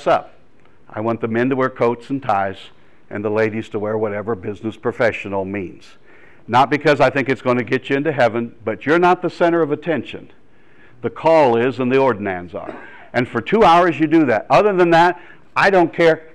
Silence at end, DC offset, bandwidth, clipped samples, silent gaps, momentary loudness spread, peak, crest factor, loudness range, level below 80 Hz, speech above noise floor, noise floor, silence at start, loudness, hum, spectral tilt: 0.15 s; 0.7%; 10.5 kHz; under 0.1%; none; 14 LU; -6 dBFS; 12 dB; 7 LU; -52 dBFS; 36 dB; -53 dBFS; 0 s; -17 LUFS; none; -6.5 dB/octave